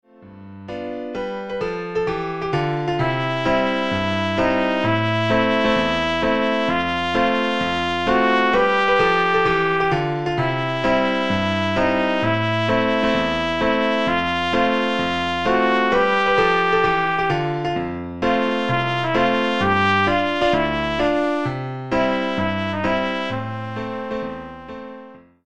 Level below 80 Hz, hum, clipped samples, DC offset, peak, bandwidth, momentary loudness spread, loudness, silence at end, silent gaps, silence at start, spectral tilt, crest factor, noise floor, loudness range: -46 dBFS; none; under 0.1%; 1%; -4 dBFS; 10 kHz; 11 LU; -20 LUFS; 0 s; none; 0 s; -6 dB/octave; 16 dB; -42 dBFS; 5 LU